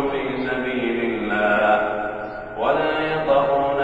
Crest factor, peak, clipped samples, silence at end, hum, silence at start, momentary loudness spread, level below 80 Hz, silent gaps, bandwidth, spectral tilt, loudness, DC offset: 16 dB; -4 dBFS; under 0.1%; 0 s; none; 0 s; 8 LU; -46 dBFS; none; 8 kHz; -7 dB/octave; -21 LUFS; under 0.1%